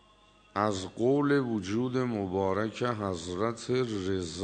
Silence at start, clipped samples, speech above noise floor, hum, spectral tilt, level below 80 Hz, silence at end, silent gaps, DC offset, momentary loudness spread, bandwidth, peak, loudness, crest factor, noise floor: 0.55 s; under 0.1%; 31 dB; none; -6 dB/octave; -62 dBFS; 0 s; none; under 0.1%; 6 LU; 9.4 kHz; -10 dBFS; -30 LUFS; 20 dB; -61 dBFS